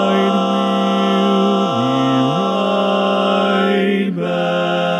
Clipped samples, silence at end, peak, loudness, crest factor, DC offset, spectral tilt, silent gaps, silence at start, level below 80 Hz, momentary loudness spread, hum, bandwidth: under 0.1%; 0 s; -4 dBFS; -16 LUFS; 12 dB; under 0.1%; -6.5 dB/octave; none; 0 s; -68 dBFS; 3 LU; none; 10 kHz